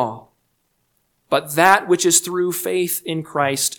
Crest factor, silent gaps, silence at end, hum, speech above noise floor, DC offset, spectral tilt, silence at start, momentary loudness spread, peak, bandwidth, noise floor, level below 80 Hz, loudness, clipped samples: 20 dB; none; 0.05 s; none; 50 dB; under 0.1%; -2.5 dB/octave; 0 s; 10 LU; 0 dBFS; 19.5 kHz; -68 dBFS; -66 dBFS; -18 LUFS; under 0.1%